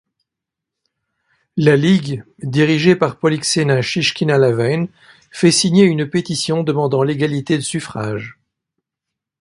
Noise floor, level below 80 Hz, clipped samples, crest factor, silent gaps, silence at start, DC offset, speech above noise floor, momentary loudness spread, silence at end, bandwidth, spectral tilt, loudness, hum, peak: -83 dBFS; -56 dBFS; under 0.1%; 18 dB; none; 1.55 s; under 0.1%; 68 dB; 12 LU; 1.1 s; 11.5 kHz; -5 dB/octave; -16 LUFS; none; 0 dBFS